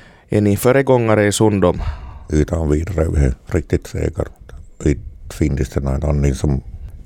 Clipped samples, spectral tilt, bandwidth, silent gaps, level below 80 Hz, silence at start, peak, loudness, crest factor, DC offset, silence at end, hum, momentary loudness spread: under 0.1%; -6.5 dB/octave; 17 kHz; none; -26 dBFS; 0.3 s; -2 dBFS; -18 LUFS; 16 dB; under 0.1%; 0.05 s; none; 12 LU